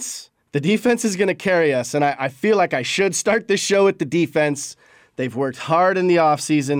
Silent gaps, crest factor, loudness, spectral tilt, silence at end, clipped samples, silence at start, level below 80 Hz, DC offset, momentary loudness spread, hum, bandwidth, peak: none; 12 dB; -19 LUFS; -4.5 dB/octave; 0 s; under 0.1%; 0 s; -64 dBFS; under 0.1%; 11 LU; none; 19 kHz; -6 dBFS